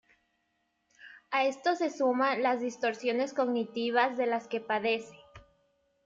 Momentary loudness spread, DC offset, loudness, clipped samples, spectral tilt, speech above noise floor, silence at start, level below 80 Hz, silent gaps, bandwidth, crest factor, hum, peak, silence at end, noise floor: 5 LU; under 0.1%; -30 LUFS; under 0.1%; -4 dB/octave; 48 dB; 1.05 s; -74 dBFS; none; 7.8 kHz; 18 dB; none; -14 dBFS; 0.65 s; -77 dBFS